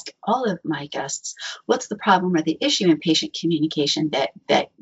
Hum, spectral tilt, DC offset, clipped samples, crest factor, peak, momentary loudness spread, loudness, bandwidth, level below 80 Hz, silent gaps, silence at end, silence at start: none; -3 dB/octave; under 0.1%; under 0.1%; 18 dB; -4 dBFS; 9 LU; -22 LUFS; 8 kHz; -68 dBFS; none; 0.15 s; 0.05 s